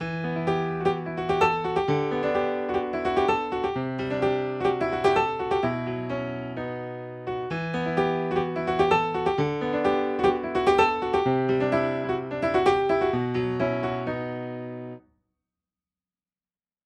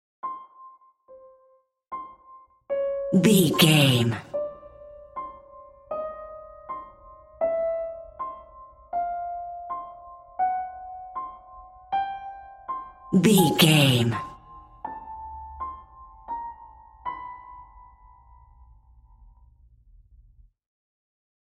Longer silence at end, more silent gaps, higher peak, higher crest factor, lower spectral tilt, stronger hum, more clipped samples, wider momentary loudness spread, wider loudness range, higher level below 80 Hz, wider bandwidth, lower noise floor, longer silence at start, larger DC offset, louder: second, 1.85 s vs 3.65 s; neither; second, -8 dBFS vs -4 dBFS; second, 18 dB vs 24 dB; first, -7 dB/octave vs -5 dB/octave; neither; neither; second, 10 LU vs 26 LU; second, 5 LU vs 17 LU; about the same, -52 dBFS vs -56 dBFS; second, 9.4 kHz vs 16 kHz; first, under -90 dBFS vs -62 dBFS; second, 0 s vs 0.25 s; neither; about the same, -26 LUFS vs -24 LUFS